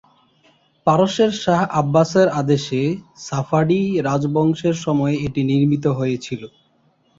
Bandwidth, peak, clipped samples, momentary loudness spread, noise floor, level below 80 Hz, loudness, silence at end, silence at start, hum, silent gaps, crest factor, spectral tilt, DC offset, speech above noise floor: 7.8 kHz; -2 dBFS; under 0.1%; 8 LU; -60 dBFS; -54 dBFS; -19 LUFS; 0.7 s; 0.85 s; none; none; 16 dB; -6.5 dB/octave; under 0.1%; 42 dB